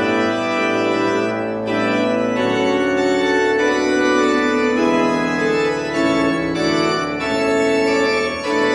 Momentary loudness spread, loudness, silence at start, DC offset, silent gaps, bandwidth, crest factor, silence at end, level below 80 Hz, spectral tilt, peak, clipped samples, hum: 3 LU; -17 LUFS; 0 s; under 0.1%; none; 11 kHz; 12 dB; 0 s; -50 dBFS; -4.5 dB/octave; -4 dBFS; under 0.1%; none